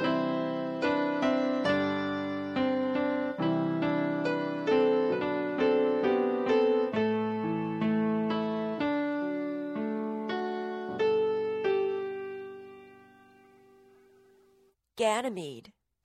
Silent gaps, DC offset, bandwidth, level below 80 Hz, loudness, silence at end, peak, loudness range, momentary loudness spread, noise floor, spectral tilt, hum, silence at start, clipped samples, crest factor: none; under 0.1%; 10 kHz; -70 dBFS; -29 LUFS; 0.45 s; -14 dBFS; 10 LU; 8 LU; -66 dBFS; -6.5 dB/octave; none; 0 s; under 0.1%; 16 dB